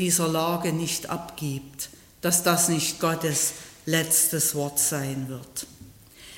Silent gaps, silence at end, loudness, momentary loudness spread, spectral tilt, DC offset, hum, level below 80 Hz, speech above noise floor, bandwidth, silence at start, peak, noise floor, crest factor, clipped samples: none; 0 s; -24 LUFS; 16 LU; -3 dB/octave; under 0.1%; none; -60 dBFS; 23 dB; 16.5 kHz; 0 s; -6 dBFS; -48 dBFS; 20 dB; under 0.1%